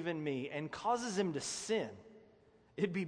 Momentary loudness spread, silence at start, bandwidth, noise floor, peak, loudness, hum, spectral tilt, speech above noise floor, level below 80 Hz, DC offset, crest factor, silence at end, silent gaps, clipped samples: 10 LU; 0 s; 10.5 kHz; -66 dBFS; -22 dBFS; -38 LUFS; none; -4.5 dB/octave; 29 dB; -74 dBFS; under 0.1%; 18 dB; 0 s; none; under 0.1%